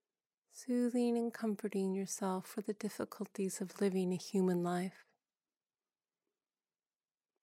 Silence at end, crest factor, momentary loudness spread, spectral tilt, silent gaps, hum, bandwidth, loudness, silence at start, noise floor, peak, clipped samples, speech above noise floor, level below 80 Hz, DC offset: 2.5 s; 14 dB; 9 LU; -6 dB/octave; none; none; 16 kHz; -38 LUFS; 0.55 s; under -90 dBFS; -24 dBFS; under 0.1%; over 53 dB; under -90 dBFS; under 0.1%